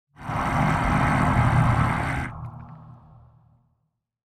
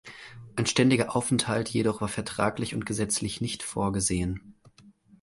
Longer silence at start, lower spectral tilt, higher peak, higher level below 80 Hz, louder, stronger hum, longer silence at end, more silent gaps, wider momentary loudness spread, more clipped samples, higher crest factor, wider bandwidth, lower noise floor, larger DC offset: first, 0.2 s vs 0.05 s; first, -7 dB/octave vs -4.5 dB/octave; about the same, -8 dBFS vs -8 dBFS; first, -36 dBFS vs -50 dBFS; first, -23 LUFS vs -27 LUFS; neither; first, 1.45 s vs 0.3 s; neither; first, 19 LU vs 10 LU; neither; about the same, 16 dB vs 20 dB; about the same, 12.5 kHz vs 11.5 kHz; first, -75 dBFS vs -56 dBFS; neither